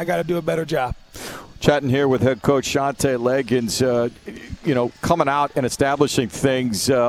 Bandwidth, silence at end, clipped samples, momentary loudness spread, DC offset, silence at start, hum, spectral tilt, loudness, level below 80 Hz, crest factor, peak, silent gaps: 16 kHz; 0 s; under 0.1%; 10 LU; under 0.1%; 0 s; none; -5 dB/octave; -20 LUFS; -44 dBFS; 20 dB; 0 dBFS; none